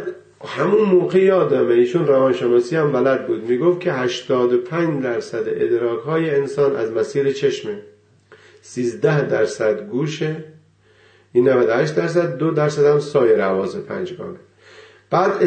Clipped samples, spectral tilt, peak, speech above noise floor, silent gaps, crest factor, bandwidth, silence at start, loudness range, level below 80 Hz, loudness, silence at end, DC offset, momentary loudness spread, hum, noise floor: under 0.1%; -6.5 dB/octave; -4 dBFS; 36 dB; none; 14 dB; 9 kHz; 0 s; 5 LU; -66 dBFS; -18 LUFS; 0 s; under 0.1%; 11 LU; none; -53 dBFS